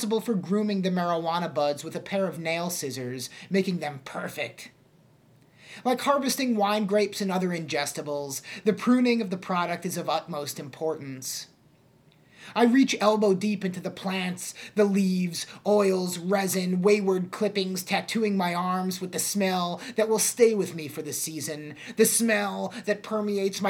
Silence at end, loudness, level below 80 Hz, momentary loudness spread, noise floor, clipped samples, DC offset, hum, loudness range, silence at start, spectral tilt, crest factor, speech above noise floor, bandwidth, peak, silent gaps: 0 s; -26 LUFS; -76 dBFS; 11 LU; -59 dBFS; under 0.1%; under 0.1%; none; 5 LU; 0 s; -4.5 dB/octave; 20 dB; 33 dB; 18 kHz; -6 dBFS; none